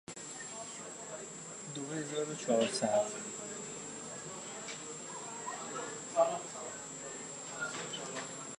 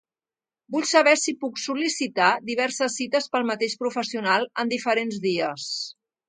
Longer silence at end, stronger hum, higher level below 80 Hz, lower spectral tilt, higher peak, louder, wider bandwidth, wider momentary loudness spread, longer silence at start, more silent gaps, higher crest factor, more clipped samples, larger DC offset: second, 0.05 s vs 0.35 s; neither; about the same, -78 dBFS vs -76 dBFS; about the same, -3 dB/octave vs -2.5 dB/octave; second, -16 dBFS vs -4 dBFS; second, -38 LUFS vs -24 LUFS; first, 11.5 kHz vs 9.6 kHz; about the same, 12 LU vs 10 LU; second, 0.1 s vs 0.7 s; neither; about the same, 22 dB vs 22 dB; neither; neither